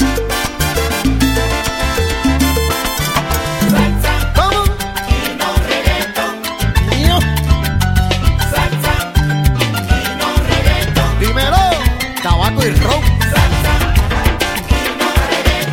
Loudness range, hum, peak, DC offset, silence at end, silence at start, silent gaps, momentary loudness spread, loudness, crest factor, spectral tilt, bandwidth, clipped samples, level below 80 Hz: 2 LU; none; 0 dBFS; under 0.1%; 0 s; 0 s; none; 4 LU; -14 LUFS; 14 dB; -4.5 dB/octave; 17.5 kHz; under 0.1%; -18 dBFS